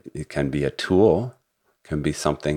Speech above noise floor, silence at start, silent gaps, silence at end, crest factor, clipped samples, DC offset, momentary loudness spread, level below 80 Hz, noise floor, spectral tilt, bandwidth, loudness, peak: 39 dB; 0.05 s; none; 0 s; 20 dB; under 0.1%; under 0.1%; 13 LU; -44 dBFS; -60 dBFS; -6 dB/octave; 15 kHz; -23 LUFS; -4 dBFS